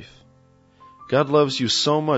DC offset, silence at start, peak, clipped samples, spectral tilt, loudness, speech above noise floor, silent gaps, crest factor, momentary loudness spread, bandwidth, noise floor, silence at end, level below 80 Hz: under 0.1%; 0 s; -6 dBFS; under 0.1%; -4.5 dB/octave; -20 LUFS; 36 dB; none; 16 dB; 4 LU; 8 kHz; -55 dBFS; 0 s; -62 dBFS